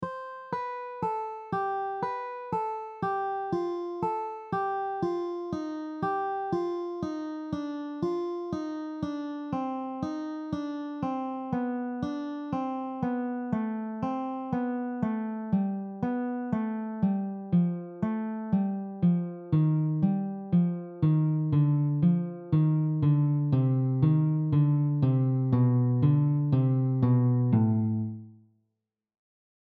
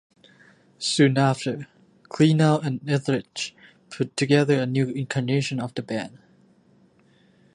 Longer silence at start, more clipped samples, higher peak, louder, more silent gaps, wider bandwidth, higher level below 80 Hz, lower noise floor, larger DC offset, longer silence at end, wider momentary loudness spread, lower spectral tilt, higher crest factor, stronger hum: second, 0 s vs 0.8 s; neither; second, -12 dBFS vs -4 dBFS; second, -29 LUFS vs -23 LUFS; neither; second, 6 kHz vs 11 kHz; about the same, -62 dBFS vs -66 dBFS; first, -83 dBFS vs -59 dBFS; neither; about the same, 1.4 s vs 1.45 s; second, 10 LU vs 14 LU; first, -10.5 dB/octave vs -6 dB/octave; about the same, 16 dB vs 20 dB; neither